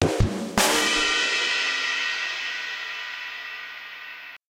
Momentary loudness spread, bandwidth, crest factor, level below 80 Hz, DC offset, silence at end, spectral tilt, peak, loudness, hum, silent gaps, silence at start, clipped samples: 16 LU; 16 kHz; 22 dB; -40 dBFS; under 0.1%; 0.1 s; -2.5 dB/octave; -4 dBFS; -23 LUFS; none; none; 0 s; under 0.1%